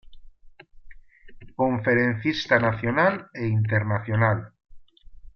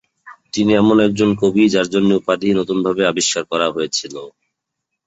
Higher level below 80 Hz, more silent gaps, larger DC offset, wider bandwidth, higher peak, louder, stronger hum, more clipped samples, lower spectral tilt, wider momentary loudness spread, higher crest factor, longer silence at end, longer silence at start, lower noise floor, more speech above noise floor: about the same, -52 dBFS vs -52 dBFS; neither; neither; second, 6.4 kHz vs 8.2 kHz; second, -6 dBFS vs -2 dBFS; second, -23 LUFS vs -16 LUFS; neither; neither; first, -7.5 dB/octave vs -4.5 dB/octave; about the same, 6 LU vs 8 LU; about the same, 18 dB vs 16 dB; second, 0.05 s vs 0.8 s; second, 0.05 s vs 0.25 s; second, -46 dBFS vs -78 dBFS; second, 23 dB vs 62 dB